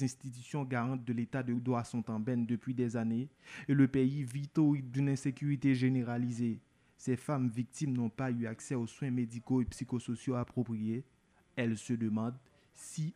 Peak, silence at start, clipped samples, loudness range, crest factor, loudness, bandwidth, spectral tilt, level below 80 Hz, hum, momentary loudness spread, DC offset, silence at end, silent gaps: -16 dBFS; 0 s; under 0.1%; 5 LU; 18 dB; -35 LUFS; 12 kHz; -7.5 dB/octave; -64 dBFS; none; 10 LU; under 0.1%; 0.05 s; none